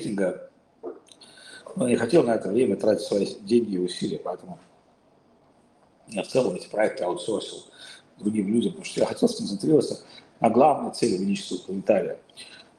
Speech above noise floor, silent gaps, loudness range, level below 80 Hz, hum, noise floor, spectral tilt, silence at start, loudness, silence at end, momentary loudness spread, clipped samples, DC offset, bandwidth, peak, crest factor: 36 dB; none; 6 LU; -68 dBFS; none; -60 dBFS; -5.5 dB/octave; 0 s; -25 LUFS; 0.2 s; 21 LU; under 0.1%; under 0.1%; 12.5 kHz; -6 dBFS; 20 dB